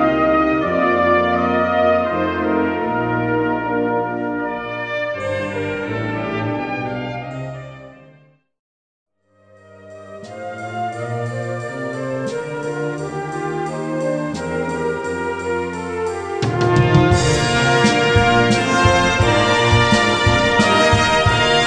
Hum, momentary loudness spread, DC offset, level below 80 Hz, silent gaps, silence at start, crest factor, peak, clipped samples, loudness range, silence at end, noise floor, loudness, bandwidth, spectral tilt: none; 12 LU; under 0.1%; -36 dBFS; 8.59-9.06 s; 0 s; 18 dB; 0 dBFS; under 0.1%; 16 LU; 0 s; -53 dBFS; -18 LUFS; 10.5 kHz; -5 dB/octave